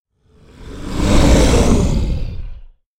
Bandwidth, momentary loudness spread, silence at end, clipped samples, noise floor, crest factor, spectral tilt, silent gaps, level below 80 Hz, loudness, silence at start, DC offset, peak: 15.5 kHz; 21 LU; 0.35 s; under 0.1%; -48 dBFS; 14 dB; -5.5 dB/octave; none; -18 dBFS; -15 LUFS; 0.6 s; under 0.1%; 0 dBFS